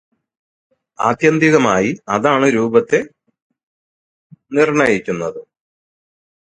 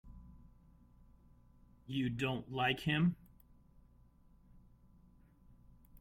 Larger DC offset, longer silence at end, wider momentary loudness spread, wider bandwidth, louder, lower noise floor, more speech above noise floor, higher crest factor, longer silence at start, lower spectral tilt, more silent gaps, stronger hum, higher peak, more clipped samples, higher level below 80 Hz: neither; second, 1.15 s vs 2.85 s; second, 11 LU vs 26 LU; second, 9.4 kHz vs 15.5 kHz; first, -15 LUFS vs -36 LUFS; first, under -90 dBFS vs -65 dBFS; first, over 75 dB vs 29 dB; about the same, 18 dB vs 22 dB; first, 1 s vs 0.05 s; about the same, -5.5 dB/octave vs -6.5 dB/octave; first, 3.42-3.50 s, 3.63-4.30 s vs none; second, none vs 60 Hz at -60 dBFS; first, 0 dBFS vs -20 dBFS; neither; first, -56 dBFS vs -62 dBFS